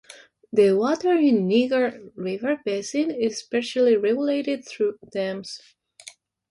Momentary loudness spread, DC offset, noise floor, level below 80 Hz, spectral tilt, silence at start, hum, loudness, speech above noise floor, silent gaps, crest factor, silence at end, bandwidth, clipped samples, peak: 10 LU; under 0.1%; -48 dBFS; -70 dBFS; -5.5 dB/octave; 0.1 s; none; -23 LUFS; 26 dB; none; 16 dB; 0.4 s; 11.5 kHz; under 0.1%; -6 dBFS